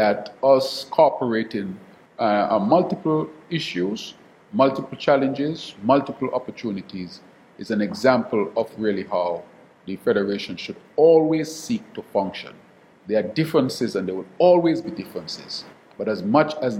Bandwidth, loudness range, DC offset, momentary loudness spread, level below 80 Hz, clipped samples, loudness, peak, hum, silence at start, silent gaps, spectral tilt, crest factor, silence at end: 16 kHz; 3 LU; under 0.1%; 14 LU; -66 dBFS; under 0.1%; -22 LUFS; -2 dBFS; none; 0 s; none; -6 dB/octave; 20 dB; 0 s